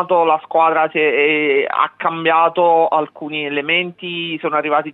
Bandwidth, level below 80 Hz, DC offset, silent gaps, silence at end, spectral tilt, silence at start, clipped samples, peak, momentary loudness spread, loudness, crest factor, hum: 4.1 kHz; -76 dBFS; under 0.1%; none; 0 s; -7.5 dB/octave; 0 s; under 0.1%; -2 dBFS; 8 LU; -16 LUFS; 14 dB; none